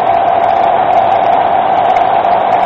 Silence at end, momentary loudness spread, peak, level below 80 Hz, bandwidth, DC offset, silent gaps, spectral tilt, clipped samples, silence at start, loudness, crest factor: 0 s; 1 LU; -2 dBFS; -46 dBFS; 6.2 kHz; under 0.1%; none; -6 dB/octave; under 0.1%; 0 s; -10 LUFS; 8 dB